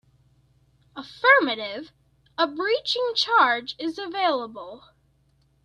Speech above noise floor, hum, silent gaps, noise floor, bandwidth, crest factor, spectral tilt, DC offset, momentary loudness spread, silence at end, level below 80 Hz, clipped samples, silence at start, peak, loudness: 41 dB; 60 Hz at -60 dBFS; none; -64 dBFS; 11 kHz; 20 dB; -2.5 dB/octave; under 0.1%; 23 LU; 0.85 s; -68 dBFS; under 0.1%; 0.95 s; -4 dBFS; -22 LUFS